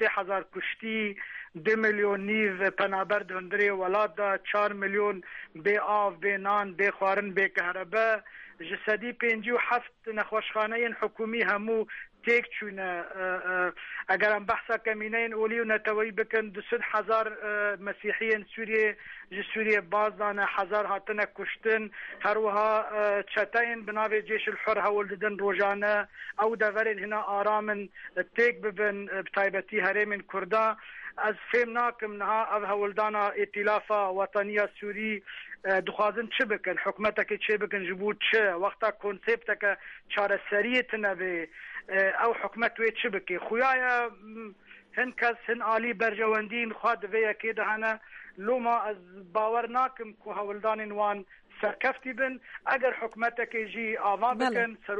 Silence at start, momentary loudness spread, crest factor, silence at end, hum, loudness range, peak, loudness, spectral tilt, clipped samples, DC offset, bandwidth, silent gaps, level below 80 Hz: 0 s; 8 LU; 16 dB; 0 s; none; 2 LU; -14 dBFS; -29 LUFS; -5.5 dB/octave; under 0.1%; under 0.1%; 8.2 kHz; none; -68 dBFS